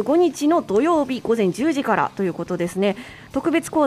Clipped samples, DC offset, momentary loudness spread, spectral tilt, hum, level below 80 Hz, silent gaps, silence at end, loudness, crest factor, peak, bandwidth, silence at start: under 0.1%; under 0.1%; 7 LU; -5.5 dB/octave; none; -56 dBFS; none; 0 s; -21 LUFS; 14 dB; -6 dBFS; 14.5 kHz; 0 s